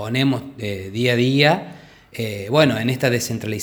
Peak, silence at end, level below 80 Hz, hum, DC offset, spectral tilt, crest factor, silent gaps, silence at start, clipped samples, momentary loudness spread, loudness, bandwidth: 0 dBFS; 0 s; -56 dBFS; none; under 0.1%; -5.5 dB/octave; 20 dB; none; 0 s; under 0.1%; 13 LU; -19 LUFS; over 20 kHz